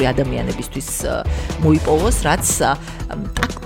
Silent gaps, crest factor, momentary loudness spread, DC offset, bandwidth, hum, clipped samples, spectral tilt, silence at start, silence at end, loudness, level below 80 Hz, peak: none; 16 dB; 10 LU; under 0.1%; 17 kHz; none; under 0.1%; -4.5 dB/octave; 0 s; 0 s; -19 LUFS; -26 dBFS; -2 dBFS